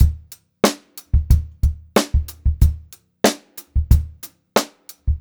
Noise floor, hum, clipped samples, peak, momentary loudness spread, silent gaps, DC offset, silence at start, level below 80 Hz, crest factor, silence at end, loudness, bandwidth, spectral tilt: -40 dBFS; none; under 0.1%; 0 dBFS; 15 LU; none; under 0.1%; 0 s; -22 dBFS; 18 dB; 0 s; -20 LUFS; over 20 kHz; -5.5 dB/octave